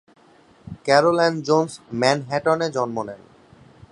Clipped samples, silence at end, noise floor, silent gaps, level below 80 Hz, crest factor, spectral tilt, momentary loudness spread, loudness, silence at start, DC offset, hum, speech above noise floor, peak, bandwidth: under 0.1%; 0.75 s; -53 dBFS; none; -60 dBFS; 22 dB; -5 dB/octave; 14 LU; -21 LUFS; 0.65 s; under 0.1%; none; 33 dB; 0 dBFS; 11 kHz